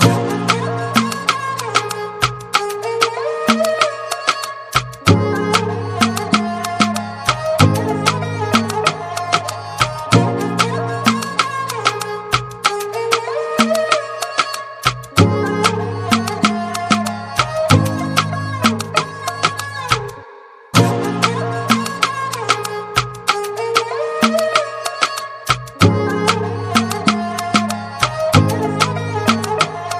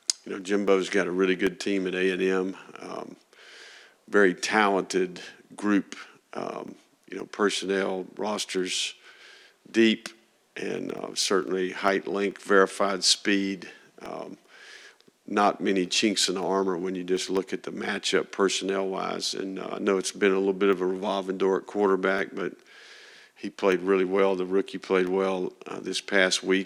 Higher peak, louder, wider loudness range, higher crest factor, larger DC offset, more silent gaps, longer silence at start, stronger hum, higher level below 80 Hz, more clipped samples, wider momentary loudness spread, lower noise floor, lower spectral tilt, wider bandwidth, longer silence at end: about the same, 0 dBFS vs -2 dBFS; first, -17 LUFS vs -26 LUFS; about the same, 2 LU vs 4 LU; second, 18 dB vs 24 dB; neither; neither; about the same, 0 s vs 0.1 s; neither; first, -46 dBFS vs -72 dBFS; neither; second, 6 LU vs 17 LU; second, -40 dBFS vs -54 dBFS; about the same, -4.5 dB/octave vs -3.5 dB/octave; first, 16 kHz vs 13 kHz; about the same, 0 s vs 0 s